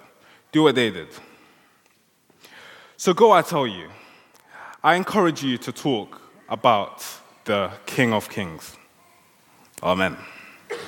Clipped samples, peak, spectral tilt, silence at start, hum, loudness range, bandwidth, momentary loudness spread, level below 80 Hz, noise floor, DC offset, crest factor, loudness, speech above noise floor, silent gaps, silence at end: under 0.1%; -2 dBFS; -5 dB/octave; 0.55 s; none; 5 LU; 17.5 kHz; 23 LU; -68 dBFS; -62 dBFS; under 0.1%; 22 dB; -21 LUFS; 40 dB; none; 0 s